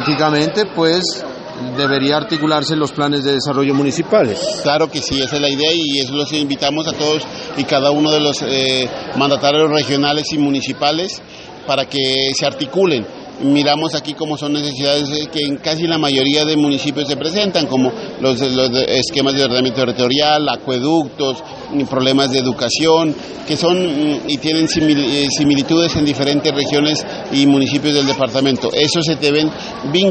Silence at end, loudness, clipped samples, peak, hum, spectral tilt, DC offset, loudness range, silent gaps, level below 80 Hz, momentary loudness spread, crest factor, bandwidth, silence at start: 0 s; -15 LUFS; under 0.1%; 0 dBFS; none; -4.5 dB/octave; under 0.1%; 2 LU; none; -48 dBFS; 7 LU; 16 dB; 8.8 kHz; 0 s